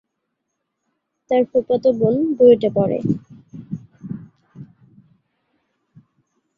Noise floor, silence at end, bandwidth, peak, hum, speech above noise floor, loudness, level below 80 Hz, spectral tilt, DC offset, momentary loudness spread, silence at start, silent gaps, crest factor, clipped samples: -76 dBFS; 1.95 s; 5.2 kHz; -2 dBFS; none; 60 dB; -17 LUFS; -58 dBFS; -9.5 dB/octave; under 0.1%; 21 LU; 1.3 s; none; 20 dB; under 0.1%